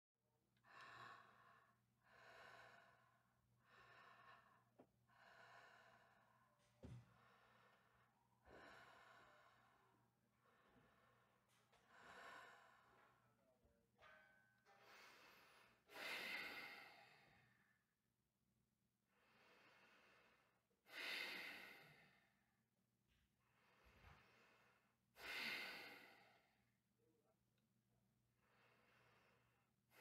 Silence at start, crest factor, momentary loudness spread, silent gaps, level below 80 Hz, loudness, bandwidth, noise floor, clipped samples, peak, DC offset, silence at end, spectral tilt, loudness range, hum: 0.55 s; 26 dB; 19 LU; none; -88 dBFS; -55 LUFS; 15.5 kHz; under -90 dBFS; under 0.1%; -38 dBFS; under 0.1%; 0 s; -2.5 dB/octave; 13 LU; none